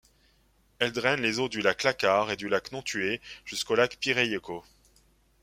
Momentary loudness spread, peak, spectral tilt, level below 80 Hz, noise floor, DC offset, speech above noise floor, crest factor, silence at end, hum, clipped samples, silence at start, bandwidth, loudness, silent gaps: 10 LU; -6 dBFS; -3.5 dB/octave; -62 dBFS; -65 dBFS; under 0.1%; 37 dB; 24 dB; 0.8 s; none; under 0.1%; 0.8 s; 16 kHz; -27 LUFS; none